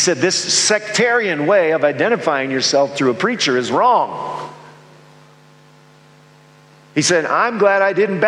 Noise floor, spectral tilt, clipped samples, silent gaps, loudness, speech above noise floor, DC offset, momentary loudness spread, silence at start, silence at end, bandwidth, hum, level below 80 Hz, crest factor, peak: -47 dBFS; -3 dB/octave; under 0.1%; none; -16 LUFS; 31 dB; under 0.1%; 6 LU; 0 s; 0 s; 12 kHz; none; -68 dBFS; 16 dB; 0 dBFS